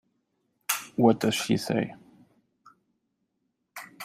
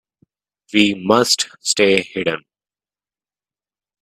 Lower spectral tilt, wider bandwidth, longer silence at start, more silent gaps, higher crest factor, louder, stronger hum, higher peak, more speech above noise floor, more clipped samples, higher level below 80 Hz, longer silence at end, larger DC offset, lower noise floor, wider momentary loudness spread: first, -4.5 dB/octave vs -3 dB/octave; about the same, 16 kHz vs 16 kHz; about the same, 0.7 s vs 0.75 s; neither; about the same, 22 dB vs 20 dB; second, -26 LUFS vs -16 LUFS; neither; second, -8 dBFS vs 0 dBFS; second, 54 dB vs over 73 dB; neither; second, -70 dBFS vs -60 dBFS; second, 0 s vs 1.65 s; neither; second, -78 dBFS vs under -90 dBFS; first, 22 LU vs 8 LU